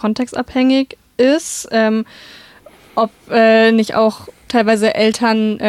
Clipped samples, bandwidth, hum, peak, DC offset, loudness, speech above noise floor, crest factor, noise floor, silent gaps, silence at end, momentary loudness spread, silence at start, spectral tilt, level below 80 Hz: under 0.1%; 14 kHz; none; -2 dBFS; under 0.1%; -15 LUFS; 29 dB; 12 dB; -44 dBFS; none; 0 s; 10 LU; 0.05 s; -4.5 dB/octave; -54 dBFS